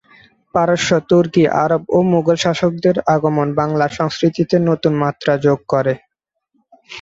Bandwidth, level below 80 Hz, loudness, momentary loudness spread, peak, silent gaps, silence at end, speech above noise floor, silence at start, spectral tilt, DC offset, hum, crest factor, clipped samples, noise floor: 7.8 kHz; -54 dBFS; -16 LUFS; 4 LU; -2 dBFS; none; 0 s; 58 dB; 0.55 s; -6 dB/octave; under 0.1%; none; 14 dB; under 0.1%; -73 dBFS